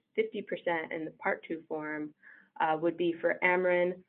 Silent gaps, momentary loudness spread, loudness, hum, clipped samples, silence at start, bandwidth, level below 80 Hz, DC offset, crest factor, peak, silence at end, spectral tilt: none; 11 LU; -32 LUFS; none; under 0.1%; 0.15 s; 4.2 kHz; -82 dBFS; under 0.1%; 18 dB; -14 dBFS; 0.05 s; -9 dB/octave